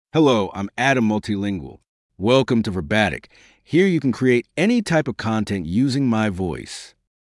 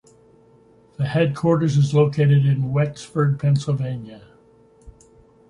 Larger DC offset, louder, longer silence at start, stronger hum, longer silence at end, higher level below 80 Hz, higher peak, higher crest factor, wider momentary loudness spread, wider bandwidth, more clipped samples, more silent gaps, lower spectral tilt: neither; about the same, -20 LUFS vs -20 LUFS; second, 0.15 s vs 1 s; neither; second, 0.4 s vs 0.6 s; about the same, -52 dBFS vs -54 dBFS; first, -2 dBFS vs -6 dBFS; about the same, 18 dB vs 16 dB; about the same, 10 LU vs 10 LU; first, 12 kHz vs 10 kHz; neither; first, 1.89-2.09 s vs none; second, -6 dB/octave vs -8 dB/octave